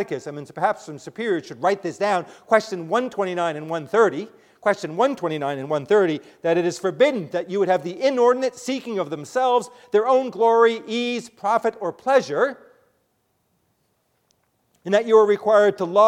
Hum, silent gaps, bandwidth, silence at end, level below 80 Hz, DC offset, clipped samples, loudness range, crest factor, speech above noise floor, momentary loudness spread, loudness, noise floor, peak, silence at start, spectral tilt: none; none; 12 kHz; 0 s; -74 dBFS; under 0.1%; under 0.1%; 4 LU; 20 dB; 48 dB; 10 LU; -21 LUFS; -69 dBFS; -2 dBFS; 0 s; -5 dB/octave